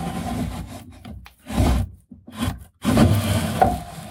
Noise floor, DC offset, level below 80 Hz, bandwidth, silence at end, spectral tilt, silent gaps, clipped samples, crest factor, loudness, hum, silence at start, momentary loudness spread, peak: -43 dBFS; under 0.1%; -32 dBFS; 18 kHz; 0 s; -6 dB/octave; none; under 0.1%; 20 dB; -22 LUFS; none; 0 s; 22 LU; -2 dBFS